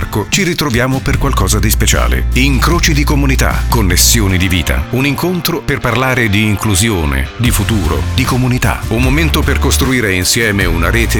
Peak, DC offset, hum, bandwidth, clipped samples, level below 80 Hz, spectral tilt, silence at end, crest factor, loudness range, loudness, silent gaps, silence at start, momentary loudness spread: 0 dBFS; 0.5%; none; over 20 kHz; under 0.1%; -18 dBFS; -4 dB/octave; 0 s; 12 dB; 2 LU; -12 LUFS; none; 0 s; 4 LU